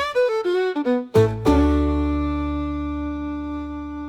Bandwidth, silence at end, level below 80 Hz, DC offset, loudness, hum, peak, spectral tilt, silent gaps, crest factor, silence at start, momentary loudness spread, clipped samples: 13 kHz; 0 s; -30 dBFS; under 0.1%; -22 LUFS; none; -6 dBFS; -7.5 dB/octave; none; 16 dB; 0 s; 10 LU; under 0.1%